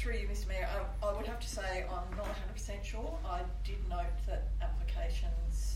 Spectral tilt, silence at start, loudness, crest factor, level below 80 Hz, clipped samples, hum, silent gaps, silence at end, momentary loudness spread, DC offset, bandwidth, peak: -5 dB/octave; 0 s; -39 LUFS; 12 dB; -36 dBFS; under 0.1%; none; none; 0 s; 4 LU; under 0.1%; 13 kHz; -22 dBFS